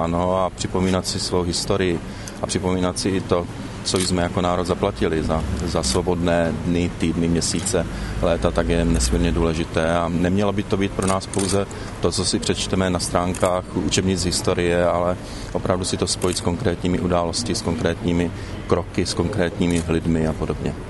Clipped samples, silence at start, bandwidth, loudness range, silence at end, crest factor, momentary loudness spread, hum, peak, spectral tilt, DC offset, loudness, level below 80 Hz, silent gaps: under 0.1%; 0 s; 12 kHz; 2 LU; 0 s; 18 dB; 4 LU; none; -2 dBFS; -5 dB/octave; under 0.1%; -21 LUFS; -34 dBFS; none